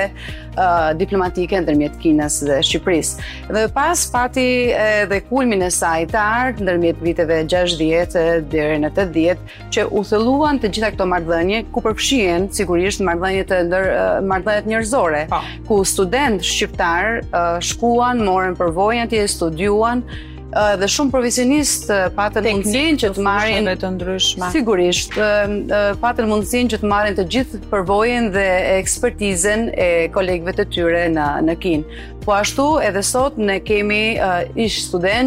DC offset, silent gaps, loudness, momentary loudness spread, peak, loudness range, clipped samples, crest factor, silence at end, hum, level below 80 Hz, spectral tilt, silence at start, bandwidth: under 0.1%; none; -17 LUFS; 4 LU; -6 dBFS; 1 LU; under 0.1%; 12 dB; 0 s; none; -34 dBFS; -4 dB/octave; 0 s; 16 kHz